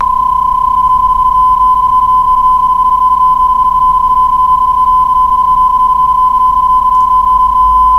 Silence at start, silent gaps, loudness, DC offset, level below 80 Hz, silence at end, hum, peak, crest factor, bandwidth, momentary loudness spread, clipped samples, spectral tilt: 0 s; none; -8 LUFS; under 0.1%; -28 dBFS; 0 s; none; 0 dBFS; 8 dB; 13 kHz; 1 LU; under 0.1%; -5 dB/octave